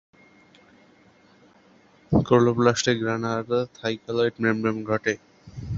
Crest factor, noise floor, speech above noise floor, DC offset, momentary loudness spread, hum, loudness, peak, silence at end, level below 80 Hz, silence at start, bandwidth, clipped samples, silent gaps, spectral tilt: 22 dB; -56 dBFS; 33 dB; under 0.1%; 10 LU; none; -24 LUFS; -4 dBFS; 0 s; -48 dBFS; 2.1 s; 7.8 kHz; under 0.1%; none; -5.5 dB/octave